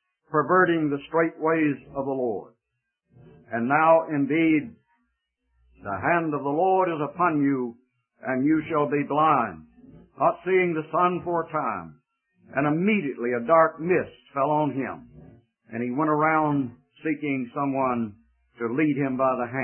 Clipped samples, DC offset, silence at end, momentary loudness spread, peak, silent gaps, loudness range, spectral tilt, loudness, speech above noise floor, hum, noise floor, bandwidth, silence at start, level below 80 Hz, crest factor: under 0.1%; under 0.1%; 0 s; 12 LU; -6 dBFS; none; 2 LU; -11.5 dB/octave; -24 LUFS; 57 dB; none; -81 dBFS; 3.3 kHz; 0.3 s; -64 dBFS; 18 dB